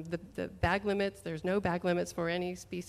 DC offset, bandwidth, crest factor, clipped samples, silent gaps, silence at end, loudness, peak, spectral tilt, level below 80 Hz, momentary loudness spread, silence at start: under 0.1%; 15 kHz; 18 dB; under 0.1%; none; 0 s; -34 LUFS; -16 dBFS; -6 dB/octave; -52 dBFS; 8 LU; 0 s